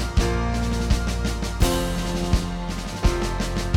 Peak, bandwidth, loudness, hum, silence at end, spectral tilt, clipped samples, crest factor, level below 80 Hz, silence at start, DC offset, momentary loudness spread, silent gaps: -6 dBFS; 17 kHz; -25 LUFS; none; 0 s; -5 dB/octave; under 0.1%; 16 dB; -26 dBFS; 0 s; under 0.1%; 4 LU; none